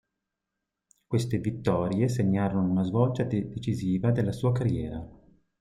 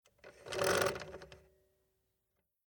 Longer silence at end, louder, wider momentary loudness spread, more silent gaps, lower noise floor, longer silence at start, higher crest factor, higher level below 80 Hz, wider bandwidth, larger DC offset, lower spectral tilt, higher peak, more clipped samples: second, 0.5 s vs 1.3 s; first, -28 LUFS vs -35 LUFS; second, 6 LU vs 23 LU; neither; about the same, -85 dBFS vs -84 dBFS; first, 1.1 s vs 0.25 s; second, 18 dB vs 24 dB; first, -54 dBFS vs -66 dBFS; second, 12 kHz vs 19.5 kHz; neither; first, -8 dB/octave vs -3 dB/octave; first, -10 dBFS vs -16 dBFS; neither